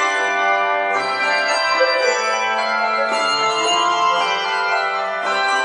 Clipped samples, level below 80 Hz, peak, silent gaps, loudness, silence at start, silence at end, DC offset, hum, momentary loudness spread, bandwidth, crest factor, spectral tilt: under 0.1%; -72 dBFS; -4 dBFS; none; -17 LUFS; 0 s; 0 s; under 0.1%; none; 3 LU; 10.5 kHz; 14 dB; -0.5 dB/octave